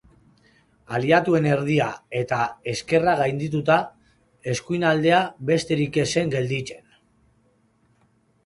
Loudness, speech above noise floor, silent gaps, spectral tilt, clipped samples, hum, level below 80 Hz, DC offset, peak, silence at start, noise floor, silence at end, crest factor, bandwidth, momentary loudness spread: -22 LUFS; 41 dB; none; -5.5 dB/octave; under 0.1%; none; -58 dBFS; under 0.1%; -4 dBFS; 0.9 s; -63 dBFS; 1.7 s; 20 dB; 11.5 kHz; 10 LU